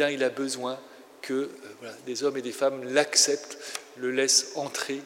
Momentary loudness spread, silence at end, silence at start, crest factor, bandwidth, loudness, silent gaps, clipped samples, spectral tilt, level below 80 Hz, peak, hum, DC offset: 18 LU; 0 s; 0 s; 22 dB; 16 kHz; -26 LUFS; none; under 0.1%; -1 dB/octave; under -90 dBFS; -6 dBFS; none; under 0.1%